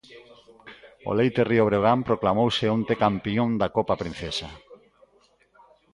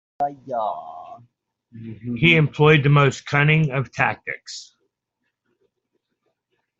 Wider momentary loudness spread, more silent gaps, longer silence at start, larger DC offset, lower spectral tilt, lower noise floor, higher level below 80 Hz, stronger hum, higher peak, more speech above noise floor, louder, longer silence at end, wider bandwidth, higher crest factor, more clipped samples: second, 10 LU vs 21 LU; neither; about the same, 0.1 s vs 0.2 s; neither; about the same, -6.5 dB/octave vs -6.5 dB/octave; second, -62 dBFS vs -78 dBFS; about the same, -52 dBFS vs -56 dBFS; neither; second, -6 dBFS vs -2 dBFS; second, 38 dB vs 58 dB; second, -24 LUFS vs -19 LUFS; second, 1.2 s vs 2.15 s; first, 11.5 kHz vs 7.8 kHz; about the same, 20 dB vs 20 dB; neither